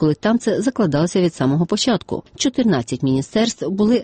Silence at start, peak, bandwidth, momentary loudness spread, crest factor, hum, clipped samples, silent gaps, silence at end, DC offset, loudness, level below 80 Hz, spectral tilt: 0 s; -6 dBFS; 8.8 kHz; 3 LU; 12 dB; none; under 0.1%; none; 0 s; under 0.1%; -19 LUFS; -50 dBFS; -5.5 dB/octave